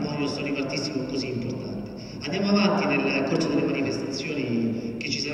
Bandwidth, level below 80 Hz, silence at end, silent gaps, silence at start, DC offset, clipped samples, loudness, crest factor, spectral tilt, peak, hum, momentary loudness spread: 11 kHz; -54 dBFS; 0 s; none; 0 s; under 0.1%; under 0.1%; -26 LUFS; 16 dB; -5.5 dB/octave; -10 dBFS; none; 10 LU